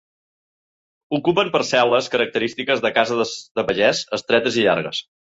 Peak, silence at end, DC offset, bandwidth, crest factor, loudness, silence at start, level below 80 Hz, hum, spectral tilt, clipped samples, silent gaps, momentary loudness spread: -2 dBFS; 0.3 s; under 0.1%; 8 kHz; 20 dB; -19 LUFS; 1.1 s; -60 dBFS; none; -4 dB/octave; under 0.1%; 3.51-3.55 s; 7 LU